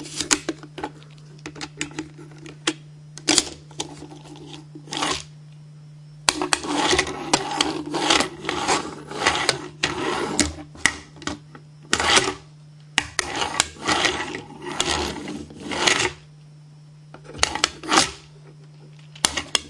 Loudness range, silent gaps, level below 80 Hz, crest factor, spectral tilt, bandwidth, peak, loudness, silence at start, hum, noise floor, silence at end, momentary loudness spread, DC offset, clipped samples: 5 LU; none; -50 dBFS; 26 dB; -1.5 dB/octave; 12 kHz; 0 dBFS; -22 LUFS; 0 s; none; -46 dBFS; 0 s; 21 LU; under 0.1%; under 0.1%